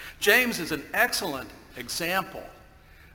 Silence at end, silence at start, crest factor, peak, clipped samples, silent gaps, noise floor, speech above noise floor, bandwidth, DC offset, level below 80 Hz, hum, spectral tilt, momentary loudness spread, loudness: 0.05 s; 0 s; 24 dB; -4 dBFS; under 0.1%; none; -52 dBFS; 25 dB; 17 kHz; under 0.1%; -54 dBFS; none; -2 dB/octave; 20 LU; -25 LUFS